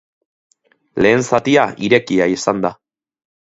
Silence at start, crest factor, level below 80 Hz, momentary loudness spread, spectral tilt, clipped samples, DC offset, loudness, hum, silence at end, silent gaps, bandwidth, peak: 0.95 s; 18 dB; -52 dBFS; 7 LU; -5 dB/octave; under 0.1%; under 0.1%; -15 LUFS; none; 0.85 s; none; 8 kHz; 0 dBFS